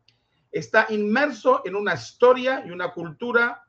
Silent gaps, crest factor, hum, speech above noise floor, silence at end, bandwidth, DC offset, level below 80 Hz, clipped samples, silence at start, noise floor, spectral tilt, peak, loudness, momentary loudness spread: none; 18 dB; none; 43 dB; 0.1 s; 7.6 kHz; under 0.1%; -70 dBFS; under 0.1%; 0.55 s; -65 dBFS; -5 dB/octave; -4 dBFS; -22 LUFS; 12 LU